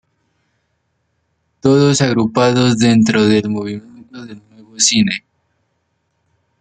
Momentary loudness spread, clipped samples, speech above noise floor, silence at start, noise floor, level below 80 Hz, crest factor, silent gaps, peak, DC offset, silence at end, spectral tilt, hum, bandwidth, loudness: 20 LU; under 0.1%; 54 dB; 1.65 s; -67 dBFS; -54 dBFS; 16 dB; none; 0 dBFS; under 0.1%; 1.4 s; -4.5 dB/octave; none; 9.4 kHz; -14 LUFS